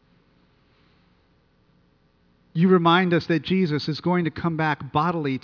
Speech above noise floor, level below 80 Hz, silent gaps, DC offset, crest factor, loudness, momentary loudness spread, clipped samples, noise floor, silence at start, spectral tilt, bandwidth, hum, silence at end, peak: 41 dB; -60 dBFS; none; under 0.1%; 18 dB; -22 LUFS; 7 LU; under 0.1%; -62 dBFS; 2.55 s; -8 dB/octave; 5.4 kHz; none; 0.05 s; -6 dBFS